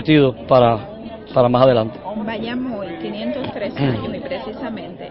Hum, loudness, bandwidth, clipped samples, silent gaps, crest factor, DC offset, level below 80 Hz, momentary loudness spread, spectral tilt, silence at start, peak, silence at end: none; -19 LUFS; 5.8 kHz; under 0.1%; none; 18 dB; under 0.1%; -46 dBFS; 14 LU; -12 dB/octave; 0 s; 0 dBFS; 0 s